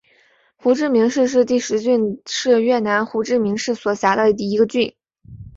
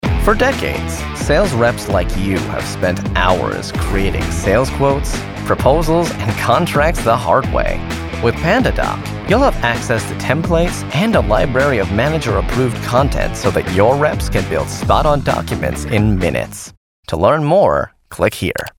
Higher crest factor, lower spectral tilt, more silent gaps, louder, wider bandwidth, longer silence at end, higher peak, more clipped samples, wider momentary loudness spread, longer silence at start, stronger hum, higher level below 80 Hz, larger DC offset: about the same, 16 dB vs 16 dB; about the same, -4.5 dB/octave vs -5.5 dB/octave; second, none vs 16.77-17.03 s; about the same, -18 LUFS vs -16 LUFS; second, 7.8 kHz vs over 20 kHz; about the same, 0.05 s vs 0.1 s; second, -4 dBFS vs 0 dBFS; neither; about the same, 6 LU vs 7 LU; first, 0.65 s vs 0.05 s; neither; second, -56 dBFS vs -24 dBFS; neither